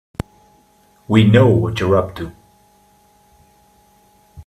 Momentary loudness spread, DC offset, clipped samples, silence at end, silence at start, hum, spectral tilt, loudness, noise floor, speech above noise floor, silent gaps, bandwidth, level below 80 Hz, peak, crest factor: 21 LU; under 0.1%; under 0.1%; 0.05 s; 1.1 s; none; -8 dB/octave; -15 LUFS; -54 dBFS; 40 dB; none; 12.5 kHz; -46 dBFS; 0 dBFS; 18 dB